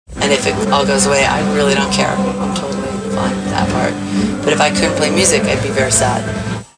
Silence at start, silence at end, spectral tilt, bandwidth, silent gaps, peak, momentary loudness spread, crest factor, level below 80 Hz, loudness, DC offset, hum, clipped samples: 0.1 s; 0.15 s; -4 dB/octave; 10.5 kHz; none; 0 dBFS; 7 LU; 14 dB; -36 dBFS; -14 LUFS; under 0.1%; none; under 0.1%